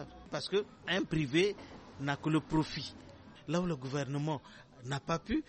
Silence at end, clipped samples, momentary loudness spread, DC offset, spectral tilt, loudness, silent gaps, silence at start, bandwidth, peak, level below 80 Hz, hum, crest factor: 0.05 s; under 0.1%; 18 LU; under 0.1%; -5.5 dB/octave; -35 LUFS; none; 0 s; 8.4 kHz; -18 dBFS; -58 dBFS; none; 18 dB